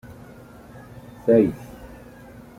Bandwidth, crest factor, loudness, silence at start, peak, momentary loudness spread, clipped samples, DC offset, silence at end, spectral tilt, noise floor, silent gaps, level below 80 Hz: 16 kHz; 22 dB; -20 LUFS; 0.1 s; -4 dBFS; 26 LU; under 0.1%; under 0.1%; 0.7 s; -9 dB/octave; -44 dBFS; none; -52 dBFS